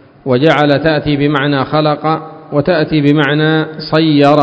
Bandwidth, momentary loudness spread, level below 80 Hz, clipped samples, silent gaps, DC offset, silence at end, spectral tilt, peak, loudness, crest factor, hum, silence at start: 8 kHz; 6 LU; -42 dBFS; 0.2%; none; under 0.1%; 0 s; -8 dB/octave; 0 dBFS; -12 LUFS; 12 dB; none; 0.25 s